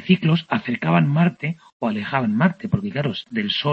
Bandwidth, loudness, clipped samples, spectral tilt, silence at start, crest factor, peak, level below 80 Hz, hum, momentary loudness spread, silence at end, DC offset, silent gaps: 6 kHz; -21 LUFS; under 0.1%; -8.5 dB/octave; 0 s; 16 dB; -4 dBFS; -56 dBFS; none; 8 LU; 0 s; under 0.1%; 1.73-1.80 s